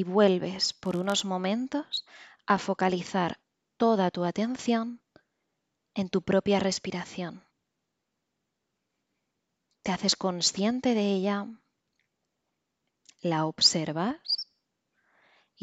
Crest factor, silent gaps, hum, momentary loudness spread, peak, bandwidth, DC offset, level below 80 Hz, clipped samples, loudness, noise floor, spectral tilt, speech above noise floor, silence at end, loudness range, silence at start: 22 dB; none; none; 14 LU; -8 dBFS; 11 kHz; under 0.1%; -68 dBFS; under 0.1%; -28 LUFS; -82 dBFS; -4 dB/octave; 55 dB; 1.2 s; 4 LU; 0 s